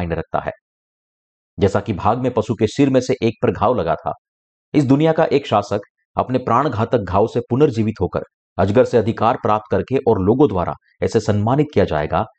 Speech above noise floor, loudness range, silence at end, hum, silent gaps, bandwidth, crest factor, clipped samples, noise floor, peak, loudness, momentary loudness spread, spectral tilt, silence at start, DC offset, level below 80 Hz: over 73 dB; 2 LU; 0.1 s; none; 0.61-1.57 s, 4.18-4.72 s, 5.90-5.95 s, 6.05-6.14 s, 8.34-8.56 s; 8.8 kHz; 14 dB; under 0.1%; under -90 dBFS; -4 dBFS; -18 LUFS; 9 LU; -7.5 dB/octave; 0 s; under 0.1%; -44 dBFS